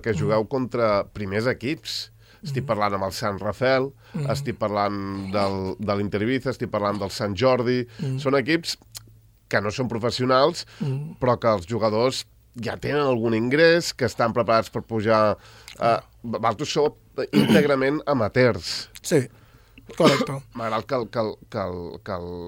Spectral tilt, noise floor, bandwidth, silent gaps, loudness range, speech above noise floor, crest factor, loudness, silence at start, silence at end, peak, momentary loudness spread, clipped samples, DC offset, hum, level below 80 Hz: -5.5 dB/octave; -52 dBFS; 16.5 kHz; none; 4 LU; 29 dB; 20 dB; -23 LUFS; 0 s; 0 s; -2 dBFS; 12 LU; under 0.1%; under 0.1%; none; -56 dBFS